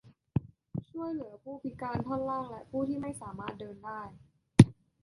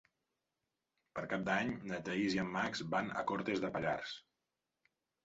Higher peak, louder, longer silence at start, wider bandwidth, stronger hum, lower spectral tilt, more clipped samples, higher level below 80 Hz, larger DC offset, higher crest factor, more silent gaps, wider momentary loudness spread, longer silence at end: first, -2 dBFS vs -22 dBFS; first, -32 LUFS vs -38 LUFS; second, 0.35 s vs 1.15 s; first, 11.5 kHz vs 7.6 kHz; neither; first, -7.5 dB/octave vs -3.5 dB/octave; neither; first, -54 dBFS vs -70 dBFS; neither; first, 30 dB vs 18 dB; neither; first, 19 LU vs 9 LU; second, 0.3 s vs 1.05 s